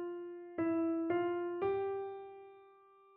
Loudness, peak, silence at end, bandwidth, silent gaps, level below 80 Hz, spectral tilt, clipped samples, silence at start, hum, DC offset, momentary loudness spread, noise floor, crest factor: -37 LUFS; -22 dBFS; 0.45 s; 3.8 kHz; none; -76 dBFS; -6 dB/octave; under 0.1%; 0 s; none; under 0.1%; 17 LU; -63 dBFS; 16 dB